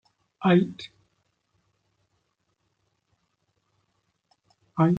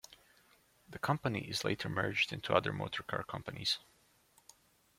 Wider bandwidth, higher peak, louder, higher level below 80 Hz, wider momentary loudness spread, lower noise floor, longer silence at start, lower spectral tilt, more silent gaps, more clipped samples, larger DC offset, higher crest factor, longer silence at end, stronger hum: second, 7 kHz vs 16.5 kHz; first, -8 dBFS vs -12 dBFS; first, -24 LUFS vs -36 LUFS; about the same, -70 dBFS vs -68 dBFS; first, 21 LU vs 8 LU; first, -75 dBFS vs -69 dBFS; first, 0.4 s vs 0.1 s; first, -8.5 dB/octave vs -4.5 dB/octave; neither; neither; neither; about the same, 22 dB vs 26 dB; second, 0 s vs 1.2 s; neither